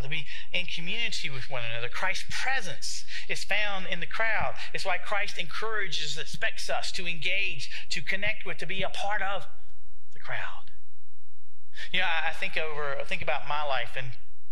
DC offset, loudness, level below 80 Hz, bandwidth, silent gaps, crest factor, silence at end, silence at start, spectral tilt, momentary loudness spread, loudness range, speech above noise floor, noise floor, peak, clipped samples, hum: 10%; -31 LUFS; -54 dBFS; 16 kHz; none; 22 dB; 0 s; 0 s; -2.5 dB/octave; 8 LU; 4 LU; 39 dB; -72 dBFS; -8 dBFS; under 0.1%; none